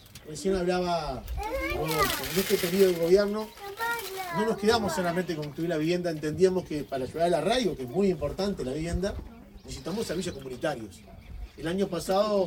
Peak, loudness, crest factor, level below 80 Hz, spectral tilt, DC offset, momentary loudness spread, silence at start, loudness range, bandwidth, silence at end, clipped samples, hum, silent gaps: -10 dBFS; -28 LUFS; 20 dB; -46 dBFS; -5 dB/octave; under 0.1%; 15 LU; 0.05 s; 7 LU; 19 kHz; 0 s; under 0.1%; none; none